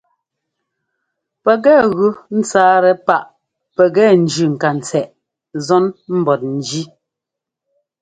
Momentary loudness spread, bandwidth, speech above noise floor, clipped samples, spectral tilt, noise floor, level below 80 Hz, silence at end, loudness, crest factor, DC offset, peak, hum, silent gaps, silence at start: 14 LU; 9.4 kHz; 69 dB; under 0.1%; -5.5 dB/octave; -83 dBFS; -60 dBFS; 1.15 s; -14 LUFS; 16 dB; under 0.1%; 0 dBFS; none; none; 1.45 s